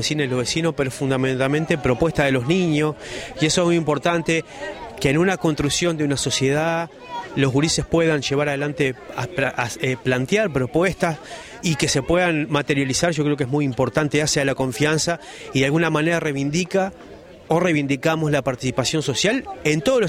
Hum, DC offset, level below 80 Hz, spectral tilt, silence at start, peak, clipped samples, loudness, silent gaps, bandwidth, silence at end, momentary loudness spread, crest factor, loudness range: none; under 0.1%; -46 dBFS; -4.5 dB/octave; 0 s; -6 dBFS; under 0.1%; -21 LUFS; none; 16 kHz; 0 s; 6 LU; 16 dB; 2 LU